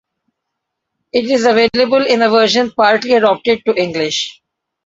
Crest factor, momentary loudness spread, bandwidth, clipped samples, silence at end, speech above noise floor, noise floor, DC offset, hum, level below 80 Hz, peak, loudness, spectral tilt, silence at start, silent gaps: 14 dB; 7 LU; 7.8 kHz; under 0.1%; 0.55 s; 63 dB; -76 dBFS; under 0.1%; none; -56 dBFS; 0 dBFS; -13 LUFS; -3.5 dB/octave; 1.15 s; none